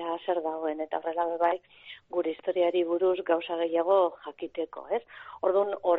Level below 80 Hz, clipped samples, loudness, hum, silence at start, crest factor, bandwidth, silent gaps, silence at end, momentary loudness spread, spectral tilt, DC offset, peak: -74 dBFS; under 0.1%; -29 LUFS; none; 0 s; 16 dB; 4.1 kHz; none; 0 s; 11 LU; -2 dB/octave; under 0.1%; -12 dBFS